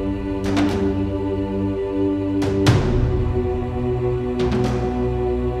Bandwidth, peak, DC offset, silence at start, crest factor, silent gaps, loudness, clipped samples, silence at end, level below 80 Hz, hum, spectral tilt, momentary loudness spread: 12.5 kHz; -4 dBFS; under 0.1%; 0 s; 16 dB; none; -21 LUFS; under 0.1%; 0 s; -30 dBFS; none; -7.5 dB/octave; 5 LU